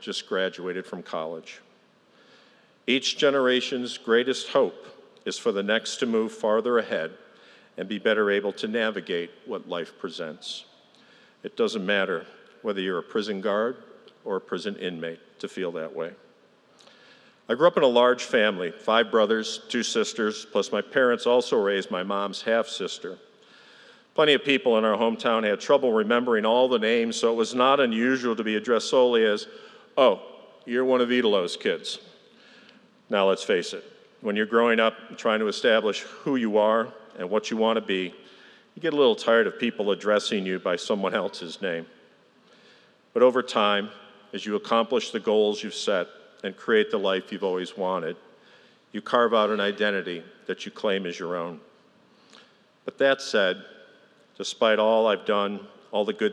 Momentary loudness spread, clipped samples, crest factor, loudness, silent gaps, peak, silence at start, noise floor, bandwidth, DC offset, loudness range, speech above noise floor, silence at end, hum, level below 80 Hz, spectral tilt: 14 LU; under 0.1%; 20 dB; -25 LUFS; none; -6 dBFS; 0 s; -59 dBFS; 11 kHz; under 0.1%; 7 LU; 35 dB; 0 s; none; -88 dBFS; -4 dB/octave